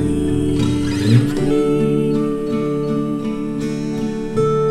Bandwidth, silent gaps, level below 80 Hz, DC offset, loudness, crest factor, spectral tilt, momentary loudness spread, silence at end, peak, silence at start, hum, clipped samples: 13 kHz; none; -36 dBFS; under 0.1%; -18 LUFS; 16 dB; -7.5 dB/octave; 7 LU; 0 s; -2 dBFS; 0 s; none; under 0.1%